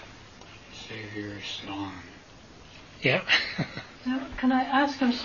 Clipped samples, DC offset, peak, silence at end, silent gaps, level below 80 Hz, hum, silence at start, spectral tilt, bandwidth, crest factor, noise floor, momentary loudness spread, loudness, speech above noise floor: under 0.1%; under 0.1%; -8 dBFS; 0 s; none; -56 dBFS; none; 0 s; -4.5 dB/octave; 7.2 kHz; 22 dB; -50 dBFS; 24 LU; -28 LUFS; 22 dB